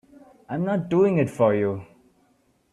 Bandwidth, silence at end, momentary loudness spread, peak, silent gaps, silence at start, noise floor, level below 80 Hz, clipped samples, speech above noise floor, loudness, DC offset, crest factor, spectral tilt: 12 kHz; 0.9 s; 11 LU; -6 dBFS; none; 0.5 s; -64 dBFS; -64 dBFS; under 0.1%; 43 dB; -23 LUFS; under 0.1%; 18 dB; -8.5 dB/octave